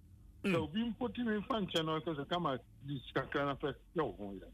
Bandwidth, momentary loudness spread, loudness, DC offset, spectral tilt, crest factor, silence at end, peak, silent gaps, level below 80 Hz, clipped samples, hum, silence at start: 15.5 kHz; 6 LU; -38 LUFS; under 0.1%; -6 dB/octave; 14 dB; 0 s; -24 dBFS; none; -60 dBFS; under 0.1%; none; 0.05 s